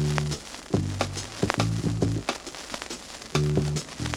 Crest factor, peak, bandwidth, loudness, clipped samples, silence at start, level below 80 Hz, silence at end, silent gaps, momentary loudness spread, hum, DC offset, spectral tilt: 26 dB; -2 dBFS; 15.5 kHz; -29 LUFS; under 0.1%; 0 s; -42 dBFS; 0 s; none; 10 LU; none; under 0.1%; -5 dB/octave